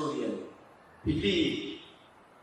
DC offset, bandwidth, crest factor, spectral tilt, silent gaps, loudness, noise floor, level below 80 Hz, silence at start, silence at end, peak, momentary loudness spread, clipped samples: under 0.1%; 11.5 kHz; 18 dB; -5.5 dB/octave; none; -32 LUFS; -57 dBFS; -52 dBFS; 0 s; 0.5 s; -16 dBFS; 19 LU; under 0.1%